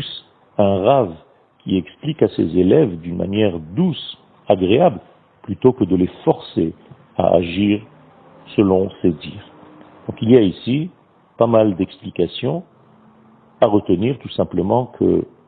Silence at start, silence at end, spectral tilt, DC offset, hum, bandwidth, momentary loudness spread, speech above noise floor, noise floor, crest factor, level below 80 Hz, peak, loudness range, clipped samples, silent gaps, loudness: 0 s; 0.25 s; -11.5 dB/octave; under 0.1%; none; 4.6 kHz; 16 LU; 33 dB; -50 dBFS; 18 dB; -50 dBFS; 0 dBFS; 2 LU; under 0.1%; none; -18 LUFS